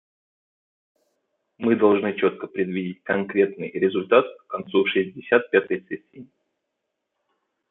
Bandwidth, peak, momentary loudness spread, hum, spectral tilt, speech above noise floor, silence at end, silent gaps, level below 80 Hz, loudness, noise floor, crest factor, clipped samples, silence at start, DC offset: 4 kHz; -2 dBFS; 11 LU; none; -9.5 dB/octave; 58 dB; 1.5 s; none; -72 dBFS; -22 LUFS; -80 dBFS; 22 dB; under 0.1%; 1.6 s; under 0.1%